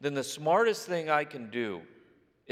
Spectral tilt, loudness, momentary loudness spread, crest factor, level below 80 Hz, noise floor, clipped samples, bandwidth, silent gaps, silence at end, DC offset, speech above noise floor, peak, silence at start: -4 dB/octave; -30 LUFS; 11 LU; 20 dB; -82 dBFS; -63 dBFS; under 0.1%; 15.5 kHz; none; 0 s; under 0.1%; 34 dB; -10 dBFS; 0 s